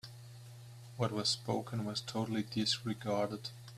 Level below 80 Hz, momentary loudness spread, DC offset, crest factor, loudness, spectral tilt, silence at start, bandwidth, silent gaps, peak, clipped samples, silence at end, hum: -72 dBFS; 19 LU; under 0.1%; 20 dB; -36 LUFS; -4.5 dB/octave; 0.05 s; 14.5 kHz; none; -18 dBFS; under 0.1%; 0 s; none